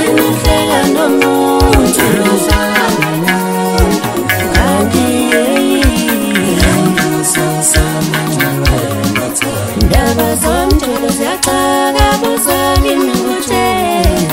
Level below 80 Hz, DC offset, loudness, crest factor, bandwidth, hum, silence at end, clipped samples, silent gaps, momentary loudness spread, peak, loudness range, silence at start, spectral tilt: -20 dBFS; 0.2%; -11 LUFS; 10 dB; 16.5 kHz; none; 0 s; under 0.1%; none; 4 LU; 0 dBFS; 2 LU; 0 s; -4.5 dB/octave